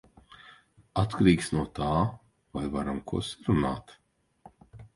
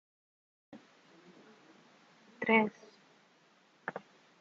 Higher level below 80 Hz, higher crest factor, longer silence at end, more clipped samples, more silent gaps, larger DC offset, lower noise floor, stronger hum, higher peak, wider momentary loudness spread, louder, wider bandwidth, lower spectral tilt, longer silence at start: first, -46 dBFS vs -88 dBFS; about the same, 22 dB vs 26 dB; second, 0.1 s vs 0.45 s; neither; neither; neither; second, -57 dBFS vs -67 dBFS; neither; first, -8 dBFS vs -12 dBFS; second, 12 LU vs 29 LU; first, -29 LUFS vs -33 LUFS; first, 11.5 kHz vs 7.2 kHz; first, -6.5 dB/octave vs -3 dB/octave; first, 0.95 s vs 0.7 s